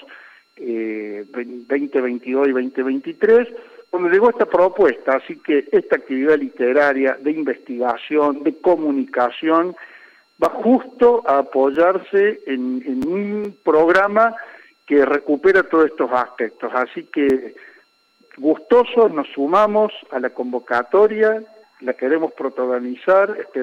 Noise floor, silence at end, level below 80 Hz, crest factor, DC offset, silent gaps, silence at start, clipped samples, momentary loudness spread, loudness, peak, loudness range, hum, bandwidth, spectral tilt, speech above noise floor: -58 dBFS; 0 s; -60 dBFS; 16 dB; under 0.1%; none; 0.1 s; under 0.1%; 10 LU; -18 LUFS; -2 dBFS; 3 LU; none; 7.2 kHz; -6.5 dB/octave; 40 dB